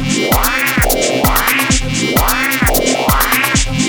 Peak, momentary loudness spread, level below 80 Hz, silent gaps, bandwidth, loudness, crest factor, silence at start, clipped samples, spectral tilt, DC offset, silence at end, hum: 0 dBFS; 2 LU; -22 dBFS; none; over 20 kHz; -12 LUFS; 12 dB; 0 s; under 0.1%; -3 dB/octave; under 0.1%; 0 s; none